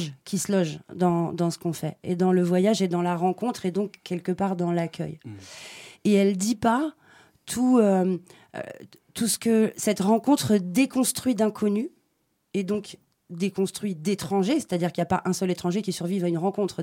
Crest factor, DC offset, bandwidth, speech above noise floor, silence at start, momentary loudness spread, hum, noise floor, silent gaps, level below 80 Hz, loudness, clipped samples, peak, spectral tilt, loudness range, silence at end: 16 dB; under 0.1%; 17 kHz; 48 dB; 0 s; 14 LU; none; -72 dBFS; none; -64 dBFS; -25 LUFS; under 0.1%; -8 dBFS; -5.5 dB/octave; 4 LU; 0 s